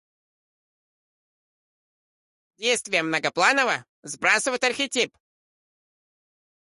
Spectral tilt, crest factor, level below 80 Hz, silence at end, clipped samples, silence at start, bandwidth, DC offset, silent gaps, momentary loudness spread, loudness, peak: -1.5 dB/octave; 22 dB; -72 dBFS; 1.6 s; under 0.1%; 2.6 s; 11.5 kHz; under 0.1%; 3.89-4.03 s; 8 LU; -23 LUFS; -6 dBFS